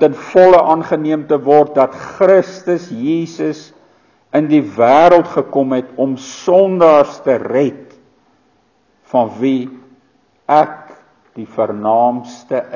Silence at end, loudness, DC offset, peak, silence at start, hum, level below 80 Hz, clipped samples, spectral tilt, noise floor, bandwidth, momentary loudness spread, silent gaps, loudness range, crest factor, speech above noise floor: 0 s; -13 LUFS; under 0.1%; 0 dBFS; 0 s; none; -56 dBFS; 0.2%; -7 dB/octave; -57 dBFS; 7.2 kHz; 12 LU; none; 7 LU; 14 dB; 44 dB